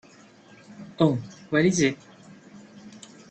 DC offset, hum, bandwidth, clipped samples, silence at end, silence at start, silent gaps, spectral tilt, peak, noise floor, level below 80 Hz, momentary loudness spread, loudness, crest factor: under 0.1%; none; 9 kHz; under 0.1%; 0.4 s; 0.7 s; none; -5.5 dB/octave; -8 dBFS; -52 dBFS; -62 dBFS; 25 LU; -24 LUFS; 20 dB